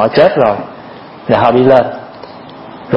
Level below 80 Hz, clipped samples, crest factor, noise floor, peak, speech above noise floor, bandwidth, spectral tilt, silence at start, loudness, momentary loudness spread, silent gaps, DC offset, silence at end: -46 dBFS; 0.3%; 12 dB; -32 dBFS; 0 dBFS; 22 dB; 5.8 kHz; -8.5 dB/octave; 0 s; -10 LUFS; 23 LU; none; under 0.1%; 0 s